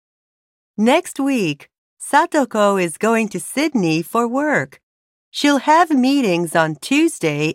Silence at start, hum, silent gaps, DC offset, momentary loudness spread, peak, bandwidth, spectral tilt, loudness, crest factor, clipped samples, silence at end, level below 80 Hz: 0.8 s; none; 1.78-1.97 s, 4.83-5.32 s; under 0.1%; 8 LU; -2 dBFS; 16 kHz; -4.5 dB/octave; -17 LUFS; 16 dB; under 0.1%; 0 s; -68 dBFS